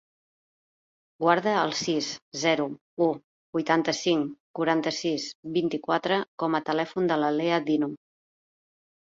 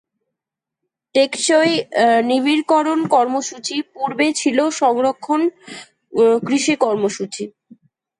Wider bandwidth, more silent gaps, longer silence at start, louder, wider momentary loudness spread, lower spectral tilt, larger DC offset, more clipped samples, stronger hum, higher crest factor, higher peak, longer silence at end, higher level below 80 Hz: second, 7.8 kHz vs 11 kHz; first, 2.22-2.31 s, 2.81-2.97 s, 3.24-3.53 s, 4.40-4.54 s, 5.35-5.43 s, 6.28-6.38 s vs none; about the same, 1.2 s vs 1.15 s; second, -27 LUFS vs -17 LUFS; second, 8 LU vs 11 LU; about the same, -4.5 dB/octave vs -3.5 dB/octave; neither; neither; neither; first, 20 dB vs 14 dB; about the same, -6 dBFS vs -4 dBFS; first, 1.25 s vs 0.7 s; about the same, -72 dBFS vs -70 dBFS